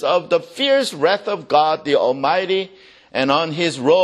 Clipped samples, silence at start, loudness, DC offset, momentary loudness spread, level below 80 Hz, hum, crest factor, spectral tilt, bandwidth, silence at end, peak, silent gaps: under 0.1%; 0 s; -18 LUFS; under 0.1%; 5 LU; -64 dBFS; none; 18 dB; -4.5 dB/octave; 12.5 kHz; 0 s; 0 dBFS; none